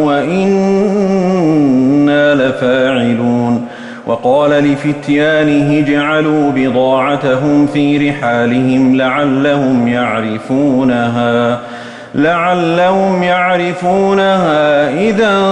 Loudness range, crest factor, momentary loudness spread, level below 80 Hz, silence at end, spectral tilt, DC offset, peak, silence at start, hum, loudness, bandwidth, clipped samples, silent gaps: 2 LU; 10 dB; 4 LU; -48 dBFS; 0 s; -7 dB/octave; under 0.1%; -2 dBFS; 0 s; none; -11 LUFS; 9.8 kHz; under 0.1%; none